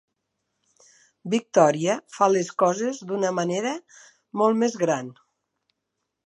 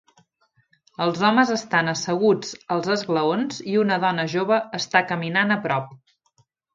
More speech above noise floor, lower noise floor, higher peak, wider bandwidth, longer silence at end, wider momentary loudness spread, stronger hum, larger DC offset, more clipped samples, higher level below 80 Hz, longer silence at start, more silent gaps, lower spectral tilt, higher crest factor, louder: first, 58 dB vs 44 dB; first, -81 dBFS vs -66 dBFS; about the same, -4 dBFS vs -2 dBFS; first, 11 kHz vs 7.8 kHz; first, 1.15 s vs 0.8 s; first, 11 LU vs 7 LU; neither; neither; neither; second, -80 dBFS vs -70 dBFS; first, 1.25 s vs 1 s; neither; about the same, -5 dB/octave vs -5 dB/octave; about the same, 22 dB vs 22 dB; about the same, -23 LUFS vs -22 LUFS